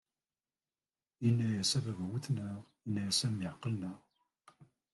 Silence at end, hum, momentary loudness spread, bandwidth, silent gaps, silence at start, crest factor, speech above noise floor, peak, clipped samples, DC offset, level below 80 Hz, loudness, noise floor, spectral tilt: 0.3 s; none; 13 LU; 12 kHz; none; 1.2 s; 18 dB; over 55 dB; -20 dBFS; under 0.1%; under 0.1%; -72 dBFS; -35 LUFS; under -90 dBFS; -4.5 dB/octave